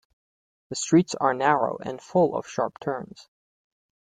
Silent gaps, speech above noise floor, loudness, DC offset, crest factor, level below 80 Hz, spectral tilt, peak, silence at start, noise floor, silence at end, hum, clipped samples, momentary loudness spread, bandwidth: none; over 66 dB; -25 LUFS; under 0.1%; 20 dB; -66 dBFS; -5 dB/octave; -6 dBFS; 0.7 s; under -90 dBFS; 0.85 s; none; under 0.1%; 13 LU; 9.4 kHz